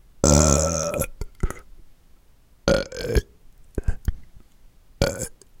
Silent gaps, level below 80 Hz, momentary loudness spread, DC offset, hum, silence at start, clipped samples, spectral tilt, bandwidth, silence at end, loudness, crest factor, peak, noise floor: none; -30 dBFS; 16 LU; under 0.1%; none; 0.25 s; under 0.1%; -4.5 dB/octave; 17 kHz; 0.3 s; -23 LUFS; 22 dB; -2 dBFS; -53 dBFS